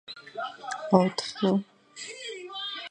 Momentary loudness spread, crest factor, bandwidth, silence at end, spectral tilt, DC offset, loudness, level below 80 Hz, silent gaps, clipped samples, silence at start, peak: 17 LU; 26 dB; 9.8 kHz; 0 s; -5.5 dB/octave; under 0.1%; -29 LUFS; -74 dBFS; none; under 0.1%; 0.1 s; -4 dBFS